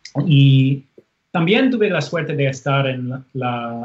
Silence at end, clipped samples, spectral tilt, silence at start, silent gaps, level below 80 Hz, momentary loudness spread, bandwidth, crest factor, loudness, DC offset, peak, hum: 0 s; under 0.1%; -7 dB/octave; 0.05 s; none; -64 dBFS; 12 LU; 7.6 kHz; 14 dB; -18 LUFS; under 0.1%; -2 dBFS; none